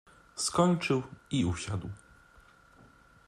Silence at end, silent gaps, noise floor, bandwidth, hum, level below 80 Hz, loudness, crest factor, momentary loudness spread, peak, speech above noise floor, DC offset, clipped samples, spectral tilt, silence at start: 1.3 s; none; -59 dBFS; 13.5 kHz; none; -60 dBFS; -31 LUFS; 22 dB; 19 LU; -12 dBFS; 29 dB; under 0.1%; under 0.1%; -5 dB/octave; 0.35 s